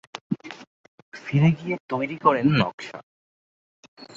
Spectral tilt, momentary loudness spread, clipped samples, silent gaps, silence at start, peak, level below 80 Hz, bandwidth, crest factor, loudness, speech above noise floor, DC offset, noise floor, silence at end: -7.5 dB/octave; 22 LU; under 0.1%; 0.21-0.30 s, 0.67-1.12 s, 1.80-1.89 s, 2.74-2.78 s, 3.03-3.97 s; 0.15 s; -4 dBFS; -60 dBFS; 7.6 kHz; 22 dB; -23 LUFS; over 68 dB; under 0.1%; under -90 dBFS; 0.1 s